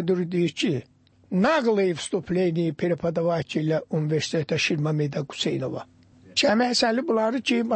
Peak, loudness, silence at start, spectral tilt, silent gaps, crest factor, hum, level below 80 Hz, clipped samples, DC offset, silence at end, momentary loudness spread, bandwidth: -10 dBFS; -24 LUFS; 0 s; -5.5 dB/octave; none; 14 dB; none; -62 dBFS; under 0.1%; under 0.1%; 0 s; 7 LU; 8.8 kHz